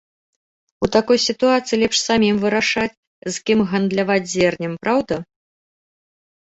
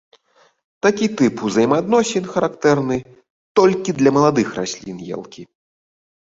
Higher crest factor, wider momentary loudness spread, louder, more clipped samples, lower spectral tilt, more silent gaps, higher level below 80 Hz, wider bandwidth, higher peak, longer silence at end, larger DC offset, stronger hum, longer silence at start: about the same, 18 dB vs 18 dB; second, 10 LU vs 14 LU; about the same, -18 LUFS vs -18 LUFS; neither; second, -4 dB/octave vs -5.5 dB/octave; about the same, 2.97-3.22 s vs 3.30-3.55 s; about the same, -52 dBFS vs -56 dBFS; about the same, 8.2 kHz vs 7.8 kHz; about the same, -2 dBFS vs -2 dBFS; first, 1.25 s vs 0.95 s; neither; neither; about the same, 0.8 s vs 0.85 s